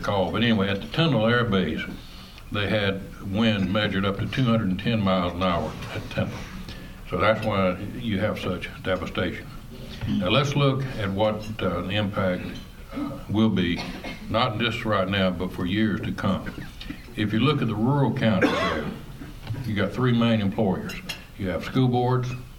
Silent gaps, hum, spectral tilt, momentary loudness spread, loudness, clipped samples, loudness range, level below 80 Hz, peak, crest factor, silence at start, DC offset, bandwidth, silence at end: none; none; -6.5 dB/octave; 14 LU; -25 LUFS; under 0.1%; 3 LU; -44 dBFS; -6 dBFS; 18 dB; 0 s; under 0.1%; 16.5 kHz; 0 s